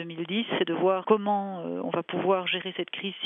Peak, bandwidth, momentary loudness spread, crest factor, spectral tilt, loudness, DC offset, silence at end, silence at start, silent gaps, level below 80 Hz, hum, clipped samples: -8 dBFS; 3.9 kHz; 8 LU; 20 dB; -8.5 dB/octave; -28 LUFS; under 0.1%; 0 s; 0 s; none; -80 dBFS; none; under 0.1%